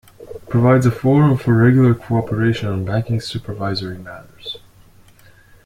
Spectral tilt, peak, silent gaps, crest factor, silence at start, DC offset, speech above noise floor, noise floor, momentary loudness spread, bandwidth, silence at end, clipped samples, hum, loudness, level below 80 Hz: -8 dB/octave; -2 dBFS; none; 16 dB; 0.2 s; under 0.1%; 31 dB; -47 dBFS; 20 LU; 12 kHz; 1.1 s; under 0.1%; none; -17 LUFS; -46 dBFS